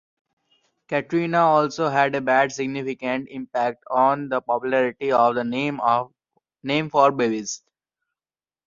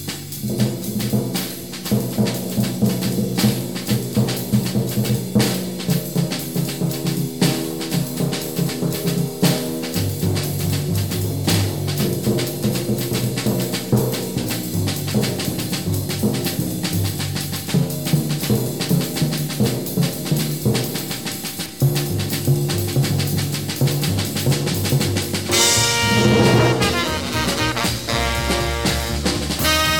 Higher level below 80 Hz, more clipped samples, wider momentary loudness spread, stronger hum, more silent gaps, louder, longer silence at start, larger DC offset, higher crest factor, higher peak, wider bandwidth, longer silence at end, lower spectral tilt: second, -68 dBFS vs -38 dBFS; neither; first, 9 LU vs 6 LU; neither; neither; about the same, -22 LUFS vs -20 LUFS; first, 0.9 s vs 0 s; second, under 0.1% vs 0.5%; about the same, 20 dB vs 18 dB; about the same, -4 dBFS vs -2 dBFS; second, 7.4 kHz vs 17.5 kHz; first, 1.1 s vs 0 s; about the same, -5 dB/octave vs -4.5 dB/octave